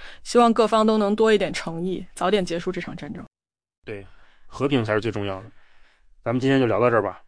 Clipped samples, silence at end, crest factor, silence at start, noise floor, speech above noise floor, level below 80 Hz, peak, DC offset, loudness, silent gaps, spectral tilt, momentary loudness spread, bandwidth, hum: under 0.1%; 0.1 s; 18 dB; 0 s; -51 dBFS; 29 dB; -50 dBFS; -6 dBFS; under 0.1%; -22 LUFS; 3.78-3.82 s; -6 dB/octave; 18 LU; 10.5 kHz; none